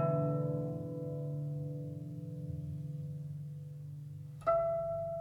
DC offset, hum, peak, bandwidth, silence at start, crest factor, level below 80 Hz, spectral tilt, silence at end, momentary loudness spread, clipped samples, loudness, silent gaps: under 0.1%; none; -20 dBFS; 4.2 kHz; 0 s; 18 dB; -64 dBFS; -10.5 dB/octave; 0 s; 14 LU; under 0.1%; -38 LUFS; none